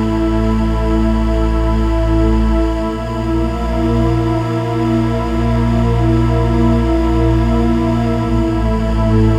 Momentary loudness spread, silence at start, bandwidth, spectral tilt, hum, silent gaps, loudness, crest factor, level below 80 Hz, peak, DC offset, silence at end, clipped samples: 4 LU; 0 s; 9.4 kHz; -8.5 dB/octave; none; none; -15 LUFS; 12 dB; -18 dBFS; -2 dBFS; under 0.1%; 0 s; under 0.1%